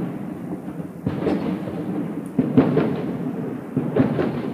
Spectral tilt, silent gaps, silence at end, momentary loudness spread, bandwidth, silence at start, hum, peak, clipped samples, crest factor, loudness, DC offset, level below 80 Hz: -9 dB/octave; none; 0 s; 12 LU; 14.5 kHz; 0 s; none; -2 dBFS; under 0.1%; 20 dB; -24 LUFS; under 0.1%; -54 dBFS